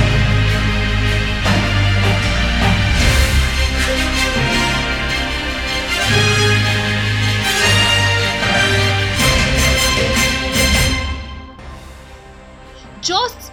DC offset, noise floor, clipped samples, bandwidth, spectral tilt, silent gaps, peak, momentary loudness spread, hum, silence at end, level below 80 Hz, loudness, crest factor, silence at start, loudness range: under 0.1%; -38 dBFS; under 0.1%; 18 kHz; -3.5 dB/octave; none; -2 dBFS; 6 LU; none; 0 s; -22 dBFS; -15 LUFS; 14 dB; 0 s; 3 LU